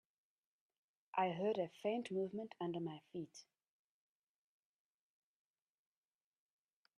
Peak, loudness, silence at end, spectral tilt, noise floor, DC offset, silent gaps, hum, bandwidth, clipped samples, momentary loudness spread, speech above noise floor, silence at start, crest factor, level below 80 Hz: -24 dBFS; -43 LUFS; 3.55 s; -6.5 dB/octave; under -90 dBFS; under 0.1%; none; none; 10.5 kHz; under 0.1%; 12 LU; over 48 dB; 1.15 s; 22 dB; under -90 dBFS